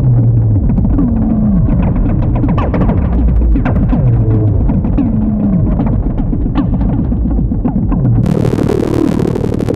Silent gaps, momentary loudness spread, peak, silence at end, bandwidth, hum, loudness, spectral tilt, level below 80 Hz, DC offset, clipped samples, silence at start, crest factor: none; 3 LU; -2 dBFS; 0 s; 8 kHz; none; -13 LUFS; -10 dB/octave; -16 dBFS; under 0.1%; under 0.1%; 0 s; 8 dB